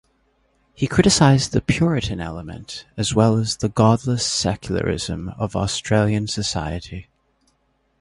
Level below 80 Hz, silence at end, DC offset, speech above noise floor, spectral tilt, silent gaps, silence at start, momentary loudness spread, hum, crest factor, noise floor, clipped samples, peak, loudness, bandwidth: -40 dBFS; 1 s; under 0.1%; 46 dB; -5 dB/octave; none; 0.8 s; 15 LU; none; 20 dB; -66 dBFS; under 0.1%; 0 dBFS; -20 LUFS; 11.5 kHz